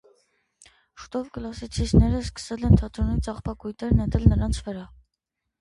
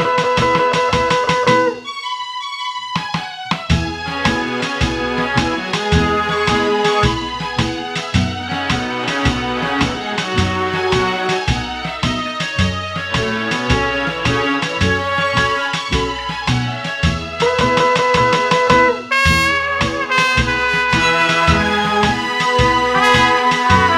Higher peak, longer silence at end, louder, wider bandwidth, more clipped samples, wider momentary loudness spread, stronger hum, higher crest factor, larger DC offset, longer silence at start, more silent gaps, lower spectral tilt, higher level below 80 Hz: second, -4 dBFS vs 0 dBFS; first, 0.75 s vs 0 s; second, -24 LUFS vs -16 LUFS; second, 11.5 kHz vs 15.5 kHz; neither; first, 14 LU vs 8 LU; neither; first, 22 dB vs 16 dB; neither; first, 1 s vs 0 s; neither; first, -7.5 dB/octave vs -4.5 dB/octave; about the same, -30 dBFS vs -32 dBFS